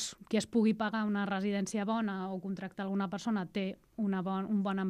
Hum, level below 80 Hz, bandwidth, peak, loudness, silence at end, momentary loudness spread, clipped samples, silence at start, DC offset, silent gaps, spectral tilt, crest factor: none; -72 dBFS; 11.5 kHz; -18 dBFS; -34 LUFS; 0 s; 8 LU; under 0.1%; 0 s; under 0.1%; none; -5.5 dB/octave; 14 dB